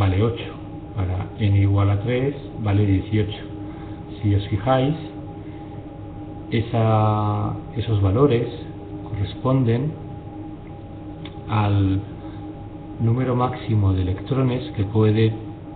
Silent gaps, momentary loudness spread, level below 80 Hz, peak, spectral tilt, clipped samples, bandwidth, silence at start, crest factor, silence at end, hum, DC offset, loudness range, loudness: none; 17 LU; -42 dBFS; -6 dBFS; -12.5 dB/octave; under 0.1%; 4.4 kHz; 0 s; 16 dB; 0 s; none; under 0.1%; 4 LU; -22 LUFS